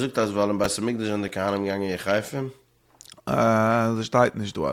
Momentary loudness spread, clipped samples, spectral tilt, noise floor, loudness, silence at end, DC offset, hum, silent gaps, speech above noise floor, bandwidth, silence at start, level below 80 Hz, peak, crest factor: 8 LU; under 0.1%; -5.5 dB/octave; -53 dBFS; -24 LUFS; 0 s; under 0.1%; none; none; 29 dB; 17.5 kHz; 0 s; -58 dBFS; -4 dBFS; 20 dB